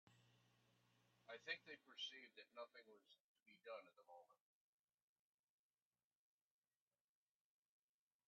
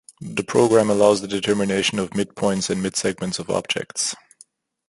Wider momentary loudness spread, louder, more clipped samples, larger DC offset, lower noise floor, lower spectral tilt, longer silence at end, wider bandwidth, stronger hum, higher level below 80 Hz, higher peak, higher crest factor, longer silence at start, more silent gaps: first, 16 LU vs 9 LU; second, -56 LUFS vs -21 LUFS; neither; neither; first, under -90 dBFS vs -54 dBFS; second, 1 dB/octave vs -4 dB/octave; first, 3.95 s vs 0.75 s; second, 7.2 kHz vs 11.5 kHz; neither; second, under -90 dBFS vs -56 dBFS; second, -34 dBFS vs -2 dBFS; first, 30 dB vs 20 dB; second, 0.05 s vs 0.2 s; first, 3.21-3.35 s, 3.42-3.46 s vs none